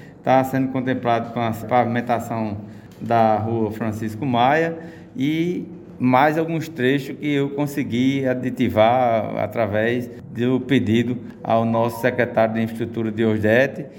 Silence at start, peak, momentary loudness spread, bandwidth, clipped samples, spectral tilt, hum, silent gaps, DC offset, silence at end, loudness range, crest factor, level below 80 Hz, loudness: 0 s; -2 dBFS; 9 LU; 17 kHz; under 0.1%; -7 dB/octave; none; none; under 0.1%; 0 s; 2 LU; 18 dB; -58 dBFS; -21 LUFS